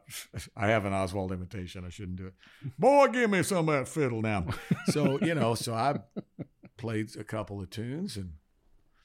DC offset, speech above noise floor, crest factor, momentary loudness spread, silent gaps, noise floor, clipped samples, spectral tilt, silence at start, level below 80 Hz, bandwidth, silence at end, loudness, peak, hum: under 0.1%; 35 dB; 20 dB; 18 LU; none; -64 dBFS; under 0.1%; -5.5 dB/octave; 0.1 s; -58 dBFS; 16.5 kHz; 0.65 s; -29 LUFS; -10 dBFS; none